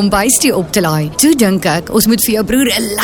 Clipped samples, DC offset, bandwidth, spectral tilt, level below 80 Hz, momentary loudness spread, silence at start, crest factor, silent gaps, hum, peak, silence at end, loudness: under 0.1%; under 0.1%; 19 kHz; -3.5 dB/octave; -36 dBFS; 4 LU; 0 s; 12 dB; none; none; 0 dBFS; 0 s; -11 LUFS